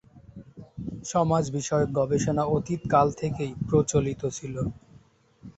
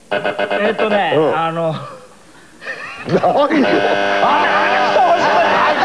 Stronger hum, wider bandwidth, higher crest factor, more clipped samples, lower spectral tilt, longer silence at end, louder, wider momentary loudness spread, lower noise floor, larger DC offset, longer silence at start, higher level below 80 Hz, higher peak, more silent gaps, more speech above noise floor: neither; second, 8.2 kHz vs 11 kHz; first, 20 dB vs 12 dB; neither; first, -6.5 dB/octave vs -5 dB/octave; about the same, 0.05 s vs 0 s; second, -26 LUFS vs -14 LUFS; about the same, 15 LU vs 14 LU; first, -56 dBFS vs -43 dBFS; second, under 0.1% vs 0.4%; about the same, 0.15 s vs 0.1 s; first, -50 dBFS vs -56 dBFS; second, -8 dBFS vs -2 dBFS; neither; about the same, 31 dB vs 28 dB